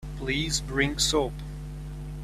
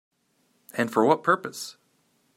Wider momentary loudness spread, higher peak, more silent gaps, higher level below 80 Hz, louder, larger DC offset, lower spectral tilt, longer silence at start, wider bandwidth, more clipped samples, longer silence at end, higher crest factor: about the same, 15 LU vs 16 LU; about the same, -8 dBFS vs -6 dBFS; neither; first, -38 dBFS vs -76 dBFS; about the same, -26 LUFS vs -24 LUFS; neither; second, -3.5 dB/octave vs -5 dB/octave; second, 0 s vs 0.75 s; about the same, 15 kHz vs 16 kHz; neither; second, 0 s vs 0.65 s; about the same, 20 dB vs 22 dB